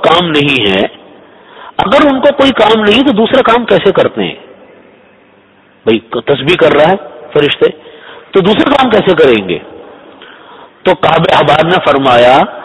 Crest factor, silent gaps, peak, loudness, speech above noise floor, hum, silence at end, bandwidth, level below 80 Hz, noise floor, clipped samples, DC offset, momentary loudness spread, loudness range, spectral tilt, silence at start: 10 dB; none; 0 dBFS; -8 LUFS; 36 dB; none; 0 s; 11 kHz; -42 dBFS; -44 dBFS; 1%; under 0.1%; 9 LU; 4 LU; -6 dB/octave; 0 s